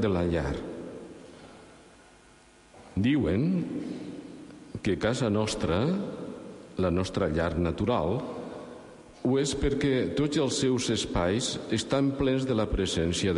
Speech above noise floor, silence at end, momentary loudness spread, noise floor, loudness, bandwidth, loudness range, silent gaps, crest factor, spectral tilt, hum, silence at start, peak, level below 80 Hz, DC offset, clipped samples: 29 dB; 0 s; 17 LU; -56 dBFS; -28 LUFS; 11.5 kHz; 5 LU; none; 14 dB; -5.5 dB/octave; none; 0 s; -14 dBFS; -44 dBFS; under 0.1%; under 0.1%